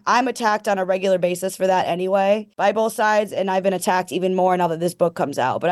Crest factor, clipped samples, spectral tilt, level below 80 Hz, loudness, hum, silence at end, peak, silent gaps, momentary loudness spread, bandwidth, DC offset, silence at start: 14 dB; under 0.1%; -5 dB/octave; -70 dBFS; -20 LUFS; none; 0 s; -6 dBFS; none; 3 LU; 12.5 kHz; under 0.1%; 0.05 s